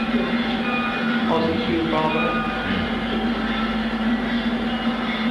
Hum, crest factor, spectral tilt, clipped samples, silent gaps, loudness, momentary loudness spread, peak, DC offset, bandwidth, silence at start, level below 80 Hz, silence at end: none; 14 dB; -6.5 dB/octave; under 0.1%; none; -22 LUFS; 3 LU; -8 dBFS; under 0.1%; 11 kHz; 0 s; -40 dBFS; 0 s